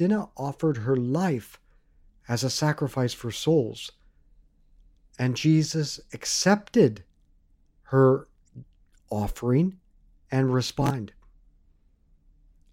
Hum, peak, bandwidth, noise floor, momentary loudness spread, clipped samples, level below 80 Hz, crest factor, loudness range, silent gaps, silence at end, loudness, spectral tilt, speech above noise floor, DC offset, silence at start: none; -8 dBFS; 16 kHz; -61 dBFS; 11 LU; under 0.1%; -50 dBFS; 20 dB; 4 LU; none; 1.65 s; -25 LUFS; -5.5 dB/octave; 37 dB; under 0.1%; 0 s